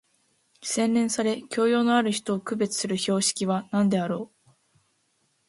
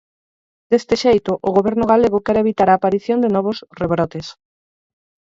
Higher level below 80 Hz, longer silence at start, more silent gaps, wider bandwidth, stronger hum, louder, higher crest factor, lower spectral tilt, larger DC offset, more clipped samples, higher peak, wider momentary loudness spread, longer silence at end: second, -70 dBFS vs -48 dBFS; about the same, 0.6 s vs 0.7 s; neither; first, 11.5 kHz vs 7.8 kHz; neither; second, -25 LUFS vs -17 LUFS; about the same, 16 dB vs 16 dB; second, -4 dB/octave vs -6.5 dB/octave; neither; neither; second, -10 dBFS vs -2 dBFS; about the same, 8 LU vs 9 LU; first, 1.25 s vs 1 s